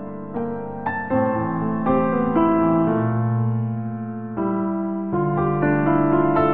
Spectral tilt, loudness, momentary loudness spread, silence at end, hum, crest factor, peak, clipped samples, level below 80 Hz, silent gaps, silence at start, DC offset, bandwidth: -13 dB/octave; -21 LUFS; 10 LU; 0 s; none; 14 dB; -6 dBFS; under 0.1%; -50 dBFS; none; 0 s; under 0.1%; 3.9 kHz